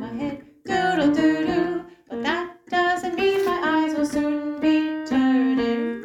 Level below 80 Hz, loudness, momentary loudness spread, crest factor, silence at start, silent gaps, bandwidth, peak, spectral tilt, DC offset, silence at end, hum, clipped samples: -56 dBFS; -22 LUFS; 9 LU; 14 dB; 0 s; none; 14.5 kHz; -8 dBFS; -5 dB/octave; under 0.1%; 0 s; none; under 0.1%